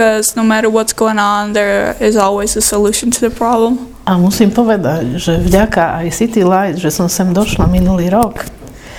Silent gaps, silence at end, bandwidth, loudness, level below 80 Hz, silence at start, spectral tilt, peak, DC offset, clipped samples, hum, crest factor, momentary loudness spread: none; 0 s; 18 kHz; -12 LUFS; -28 dBFS; 0 s; -5 dB/octave; 0 dBFS; under 0.1%; under 0.1%; none; 12 dB; 4 LU